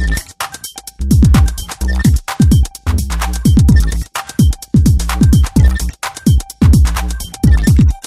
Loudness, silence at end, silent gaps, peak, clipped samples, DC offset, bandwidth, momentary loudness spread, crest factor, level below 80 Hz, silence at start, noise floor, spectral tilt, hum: -13 LUFS; 0.05 s; none; 0 dBFS; under 0.1%; under 0.1%; 15.5 kHz; 11 LU; 12 dB; -14 dBFS; 0 s; -30 dBFS; -6 dB/octave; none